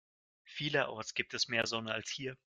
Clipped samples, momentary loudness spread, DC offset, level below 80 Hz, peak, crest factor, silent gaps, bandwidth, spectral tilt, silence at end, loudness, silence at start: under 0.1%; 8 LU; under 0.1%; -76 dBFS; -14 dBFS; 24 dB; none; 11.5 kHz; -3 dB/octave; 0.25 s; -35 LUFS; 0.45 s